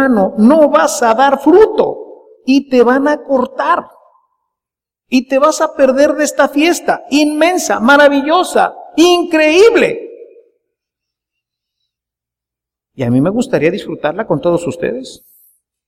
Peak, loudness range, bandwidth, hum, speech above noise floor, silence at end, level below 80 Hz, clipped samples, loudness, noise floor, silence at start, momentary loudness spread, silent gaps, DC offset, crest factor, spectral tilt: 0 dBFS; 8 LU; 16 kHz; none; 74 dB; 0.7 s; -50 dBFS; under 0.1%; -11 LUFS; -85 dBFS; 0 s; 11 LU; none; under 0.1%; 12 dB; -4.5 dB/octave